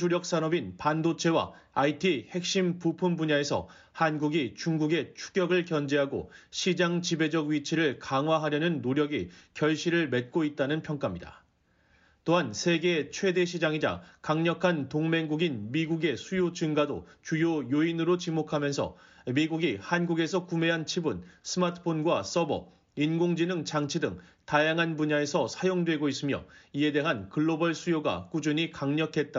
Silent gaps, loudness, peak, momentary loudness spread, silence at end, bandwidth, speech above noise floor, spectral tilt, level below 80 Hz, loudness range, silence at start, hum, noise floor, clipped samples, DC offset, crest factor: none; -29 LUFS; -10 dBFS; 6 LU; 0 s; 7.6 kHz; 39 dB; -4.5 dB/octave; -64 dBFS; 2 LU; 0 s; none; -67 dBFS; under 0.1%; under 0.1%; 18 dB